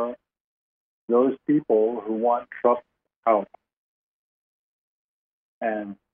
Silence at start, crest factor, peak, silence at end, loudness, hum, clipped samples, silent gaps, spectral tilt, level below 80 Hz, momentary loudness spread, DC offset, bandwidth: 0 s; 20 dB; -6 dBFS; 0.2 s; -24 LUFS; none; under 0.1%; 0.40-1.08 s, 3.16-3.23 s, 3.77-5.61 s; -6.5 dB/octave; -76 dBFS; 10 LU; under 0.1%; 3.6 kHz